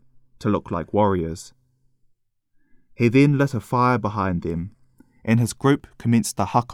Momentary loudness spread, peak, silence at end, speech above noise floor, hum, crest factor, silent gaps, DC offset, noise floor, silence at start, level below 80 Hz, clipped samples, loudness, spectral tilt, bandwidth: 12 LU; -4 dBFS; 0 s; 44 dB; none; 18 dB; none; under 0.1%; -64 dBFS; 0.4 s; -50 dBFS; under 0.1%; -21 LUFS; -6.5 dB/octave; 15.5 kHz